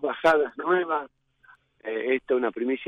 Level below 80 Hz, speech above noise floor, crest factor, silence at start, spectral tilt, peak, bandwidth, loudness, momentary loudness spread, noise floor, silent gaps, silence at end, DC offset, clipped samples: -66 dBFS; 34 dB; 16 dB; 0 s; -5.5 dB/octave; -10 dBFS; 10 kHz; -25 LUFS; 12 LU; -58 dBFS; none; 0 s; under 0.1%; under 0.1%